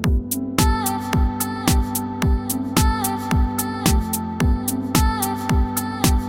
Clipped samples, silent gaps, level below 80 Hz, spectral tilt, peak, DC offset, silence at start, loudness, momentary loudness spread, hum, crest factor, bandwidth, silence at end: under 0.1%; none; -24 dBFS; -5 dB/octave; -2 dBFS; under 0.1%; 0 s; -21 LUFS; 3 LU; none; 18 dB; 17 kHz; 0 s